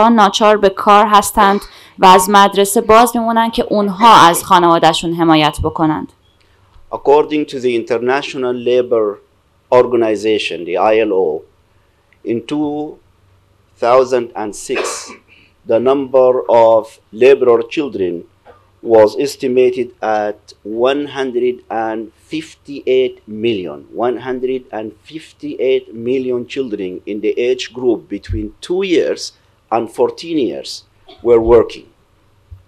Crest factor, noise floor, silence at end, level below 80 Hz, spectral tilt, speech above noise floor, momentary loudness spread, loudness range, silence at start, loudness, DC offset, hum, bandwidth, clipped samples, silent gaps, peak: 14 dB; -54 dBFS; 0.15 s; -42 dBFS; -4.5 dB/octave; 41 dB; 16 LU; 9 LU; 0 s; -13 LUFS; under 0.1%; none; 15.5 kHz; under 0.1%; none; 0 dBFS